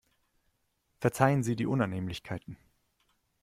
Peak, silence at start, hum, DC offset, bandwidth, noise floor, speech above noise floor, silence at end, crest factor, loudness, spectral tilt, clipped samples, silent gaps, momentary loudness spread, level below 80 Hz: -8 dBFS; 1 s; none; under 0.1%; 15.5 kHz; -76 dBFS; 47 dB; 0.85 s; 24 dB; -30 LUFS; -6.5 dB/octave; under 0.1%; none; 15 LU; -62 dBFS